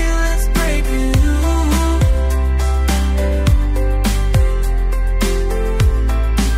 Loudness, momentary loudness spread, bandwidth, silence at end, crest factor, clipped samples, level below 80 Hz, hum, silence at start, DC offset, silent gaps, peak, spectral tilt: -17 LUFS; 3 LU; 16 kHz; 0 s; 12 dB; under 0.1%; -14 dBFS; none; 0 s; under 0.1%; none; -2 dBFS; -5.5 dB/octave